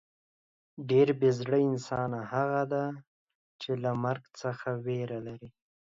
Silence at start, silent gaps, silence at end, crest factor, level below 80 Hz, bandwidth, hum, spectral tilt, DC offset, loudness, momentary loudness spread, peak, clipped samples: 0.8 s; 3.07-3.27 s, 3.35-3.59 s; 0.35 s; 18 dB; -70 dBFS; 7.6 kHz; none; -7.5 dB/octave; under 0.1%; -30 LUFS; 16 LU; -12 dBFS; under 0.1%